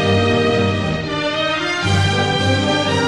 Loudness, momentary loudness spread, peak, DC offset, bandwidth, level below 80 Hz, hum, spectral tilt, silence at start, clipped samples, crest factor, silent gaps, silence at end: -17 LUFS; 5 LU; -4 dBFS; under 0.1%; 11.5 kHz; -44 dBFS; none; -5 dB/octave; 0 s; under 0.1%; 14 dB; none; 0 s